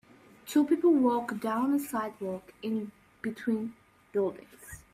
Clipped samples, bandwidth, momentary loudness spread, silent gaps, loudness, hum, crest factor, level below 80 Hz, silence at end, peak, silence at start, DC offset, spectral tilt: under 0.1%; 15.5 kHz; 19 LU; none; -30 LUFS; none; 16 dB; -66 dBFS; 0.15 s; -14 dBFS; 0.45 s; under 0.1%; -6 dB/octave